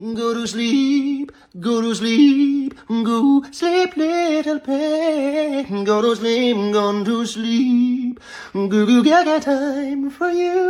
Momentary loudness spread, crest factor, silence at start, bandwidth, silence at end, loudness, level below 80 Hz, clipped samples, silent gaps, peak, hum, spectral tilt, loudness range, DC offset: 9 LU; 14 dB; 0 s; 11.5 kHz; 0 s; -18 LUFS; -60 dBFS; under 0.1%; none; -4 dBFS; none; -5 dB/octave; 1 LU; under 0.1%